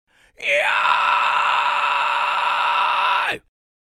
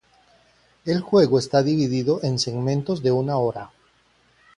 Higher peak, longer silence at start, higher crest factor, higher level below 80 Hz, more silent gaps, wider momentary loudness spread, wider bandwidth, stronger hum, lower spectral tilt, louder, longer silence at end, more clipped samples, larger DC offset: about the same, -2 dBFS vs -4 dBFS; second, 0.4 s vs 0.85 s; about the same, 18 dB vs 18 dB; second, -68 dBFS vs -58 dBFS; neither; second, 4 LU vs 9 LU; first, 15 kHz vs 11 kHz; neither; second, -0.5 dB/octave vs -6.5 dB/octave; first, -18 LUFS vs -21 LUFS; second, 0.5 s vs 0.9 s; neither; neither